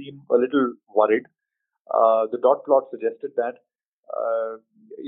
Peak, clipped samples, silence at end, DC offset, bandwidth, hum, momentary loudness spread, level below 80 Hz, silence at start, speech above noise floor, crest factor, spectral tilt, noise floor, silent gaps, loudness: -4 dBFS; under 0.1%; 0 s; under 0.1%; 3.8 kHz; none; 10 LU; -78 dBFS; 0 s; 41 dB; 20 dB; -4 dB/octave; -63 dBFS; 1.81-1.85 s, 3.88-4.03 s; -22 LUFS